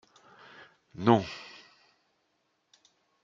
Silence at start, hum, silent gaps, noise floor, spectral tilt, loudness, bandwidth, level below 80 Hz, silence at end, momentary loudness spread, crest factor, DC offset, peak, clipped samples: 1 s; none; none; -76 dBFS; -7 dB/octave; -27 LUFS; 7.6 kHz; -72 dBFS; 1.8 s; 27 LU; 28 dB; under 0.1%; -6 dBFS; under 0.1%